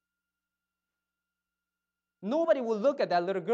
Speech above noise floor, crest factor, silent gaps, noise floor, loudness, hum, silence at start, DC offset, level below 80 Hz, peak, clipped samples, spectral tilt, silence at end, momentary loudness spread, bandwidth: 62 dB; 18 dB; none; -89 dBFS; -28 LUFS; 60 Hz at -75 dBFS; 2.2 s; under 0.1%; under -90 dBFS; -14 dBFS; under 0.1%; -6.5 dB/octave; 0 s; 6 LU; 7.6 kHz